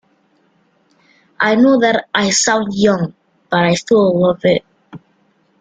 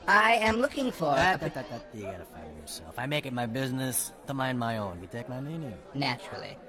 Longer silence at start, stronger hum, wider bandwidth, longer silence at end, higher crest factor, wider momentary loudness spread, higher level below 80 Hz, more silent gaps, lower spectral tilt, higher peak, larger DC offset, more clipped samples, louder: first, 1.4 s vs 0 s; neither; second, 9.6 kHz vs 19 kHz; first, 0.65 s vs 0 s; second, 14 dB vs 22 dB; second, 8 LU vs 16 LU; about the same, -54 dBFS vs -56 dBFS; neither; about the same, -4 dB/octave vs -4 dB/octave; first, -2 dBFS vs -8 dBFS; neither; neither; first, -14 LUFS vs -29 LUFS